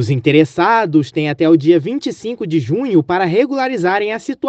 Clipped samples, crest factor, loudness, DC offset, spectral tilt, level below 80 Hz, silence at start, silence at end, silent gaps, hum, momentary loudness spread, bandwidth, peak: under 0.1%; 14 dB; -15 LUFS; under 0.1%; -7 dB/octave; -58 dBFS; 0 s; 0 s; none; none; 9 LU; 8.2 kHz; 0 dBFS